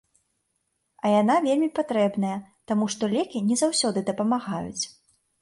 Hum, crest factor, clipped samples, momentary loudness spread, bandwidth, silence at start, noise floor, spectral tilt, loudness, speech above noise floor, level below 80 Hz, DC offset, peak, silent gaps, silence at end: none; 14 dB; under 0.1%; 10 LU; 11.5 kHz; 1.05 s; -75 dBFS; -4.5 dB/octave; -25 LUFS; 51 dB; -66 dBFS; under 0.1%; -10 dBFS; none; 0.55 s